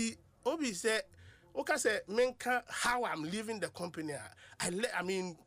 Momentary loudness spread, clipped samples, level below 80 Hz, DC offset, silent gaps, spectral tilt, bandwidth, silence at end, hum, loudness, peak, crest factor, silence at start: 10 LU; under 0.1%; -68 dBFS; under 0.1%; none; -3 dB/octave; 15.5 kHz; 0.1 s; none; -36 LUFS; -20 dBFS; 16 dB; 0 s